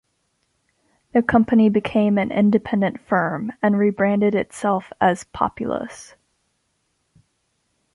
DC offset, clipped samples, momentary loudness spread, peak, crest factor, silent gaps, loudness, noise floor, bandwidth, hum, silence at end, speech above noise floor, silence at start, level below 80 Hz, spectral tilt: under 0.1%; under 0.1%; 8 LU; -4 dBFS; 18 dB; none; -20 LUFS; -70 dBFS; 11.5 kHz; none; 1.9 s; 51 dB; 1.15 s; -52 dBFS; -7 dB/octave